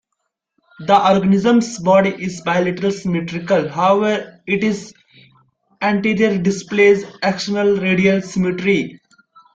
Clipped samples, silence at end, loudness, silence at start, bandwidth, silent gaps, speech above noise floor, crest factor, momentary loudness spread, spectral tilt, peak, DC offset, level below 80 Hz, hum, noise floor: under 0.1%; 0.6 s; -17 LUFS; 0.8 s; 7.8 kHz; none; 59 dB; 16 dB; 8 LU; -6 dB/octave; -2 dBFS; under 0.1%; -54 dBFS; none; -75 dBFS